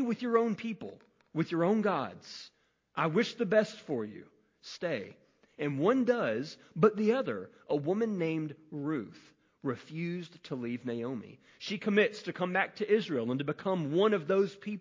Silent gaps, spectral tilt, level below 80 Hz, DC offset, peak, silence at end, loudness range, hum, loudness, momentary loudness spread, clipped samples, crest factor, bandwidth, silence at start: none; -6.5 dB/octave; -76 dBFS; under 0.1%; -12 dBFS; 0 s; 5 LU; none; -32 LUFS; 14 LU; under 0.1%; 20 dB; 7.6 kHz; 0 s